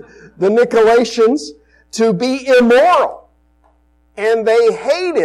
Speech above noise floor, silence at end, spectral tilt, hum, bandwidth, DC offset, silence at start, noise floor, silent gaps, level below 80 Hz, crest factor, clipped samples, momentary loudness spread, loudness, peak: 42 dB; 0 s; -4.5 dB/octave; 60 Hz at -50 dBFS; 12 kHz; under 0.1%; 0.4 s; -54 dBFS; none; -52 dBFS; 10 dB; under 0.1%; 11 LU; -13 LUFS; -4 dBFS